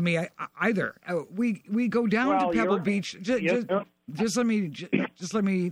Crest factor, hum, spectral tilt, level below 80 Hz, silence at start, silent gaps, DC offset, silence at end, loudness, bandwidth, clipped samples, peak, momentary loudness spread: 16 dB; none; -6 dB/octave; -64 dBFS; 0 s; none; under 0.1%; 0 s; -27 LUFS; 16 kHz; under 0.1%; -10 dBFS; 7 LU